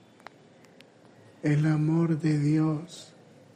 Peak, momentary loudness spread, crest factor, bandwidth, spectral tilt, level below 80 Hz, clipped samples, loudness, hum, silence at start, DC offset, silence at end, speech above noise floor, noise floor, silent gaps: -14 dBFS; 12 LU; 14 dB; 9.6 kHz; -8 dB/octave; -68 dBFS; under 0.1%; -26 LUFS; none; 1.45 s; under 0.1%; 0.5 s; 30 dB; -55 dBFS; none